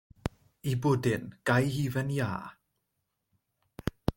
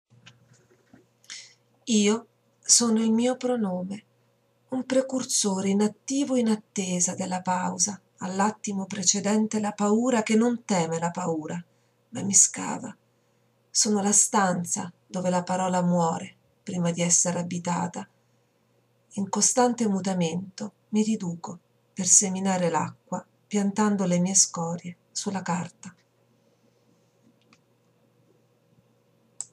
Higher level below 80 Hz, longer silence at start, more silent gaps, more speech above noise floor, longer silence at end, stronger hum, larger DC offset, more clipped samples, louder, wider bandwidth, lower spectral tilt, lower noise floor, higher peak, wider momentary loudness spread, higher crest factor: first, -50 dBFS vs -78 dBFS; second, 0.25 s vs 1.3 s; neither; first, 53 dB vs 42 dB; about the same, 0.05 s vs 0.1 s; neither; neither; neither; second, -31 LUFS vs -24 LUFS; first, 17 kHz vs 13.5 kHz; first, -6.5 dB/octave vs -3.5 dB/octave; first, -82 dBFS vs -67 dBFS; second, -8 dBFS vs -4 dBFS; second, 13 LU vs 17 LU; about the same, 22 dB vs 24 dB